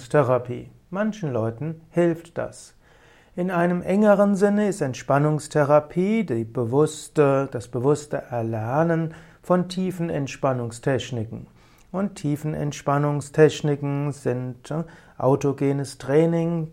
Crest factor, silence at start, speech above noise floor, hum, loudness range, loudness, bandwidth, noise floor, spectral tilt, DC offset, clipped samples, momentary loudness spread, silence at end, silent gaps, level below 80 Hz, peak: 18 dB; 0 s; 31 dB; none; 6 LU; -23 LUFS; 14.5 kHz; -53 dBFS; -7 dB/octave; under 0.1%; under 0.1%; 12 LU; 0 s; none; -56 dBFS; -4 dBFS